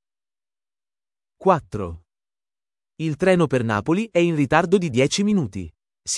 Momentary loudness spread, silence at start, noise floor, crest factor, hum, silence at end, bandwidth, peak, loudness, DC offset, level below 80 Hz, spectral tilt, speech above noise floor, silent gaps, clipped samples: 13 LU; 1.4 s; under -90 dBFS; 22 dB; none; 0 s; 12 kHz; -2 dBFS; -21 LUFS; under 0.1%; -52 dBFS; -5.5 dB/octave; over 70 dB; none; under 0.1%